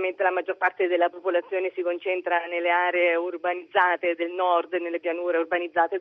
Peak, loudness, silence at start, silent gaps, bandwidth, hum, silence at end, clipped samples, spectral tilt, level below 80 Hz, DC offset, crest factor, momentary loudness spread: -6 dBFS; -25 LUFS; 0 s; none; 4 kHz; none; 0 s; under 0.1%; 0.5 dB/octave; -80 dBFS; under 0.1%; 18 dB; 6 LU